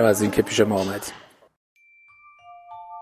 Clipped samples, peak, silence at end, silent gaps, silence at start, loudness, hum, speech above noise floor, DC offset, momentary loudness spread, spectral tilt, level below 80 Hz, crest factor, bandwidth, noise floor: under 0.1%; -4 dBFS; 0 s; 1.56-1.76 s; 0 s; -22 LUFS; none; 33 dB; under 0.1%; 23 LU; -4.5 dB/octave; -54 dBFS; 20 dB; 15.5 kHz; -54 dBFS